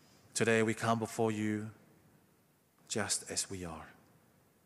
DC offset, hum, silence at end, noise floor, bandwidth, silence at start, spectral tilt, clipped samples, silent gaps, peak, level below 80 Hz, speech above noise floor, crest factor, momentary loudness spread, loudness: under 0.1%; none; 0.75 s; -70 dBFS; 15.5 kHz; 0.35 s; -4 dB/octave; under 0.1%; none; -16 dBFS; -74 dBFS; 36 dB; 22 dB; 16 LU; -34 LUFS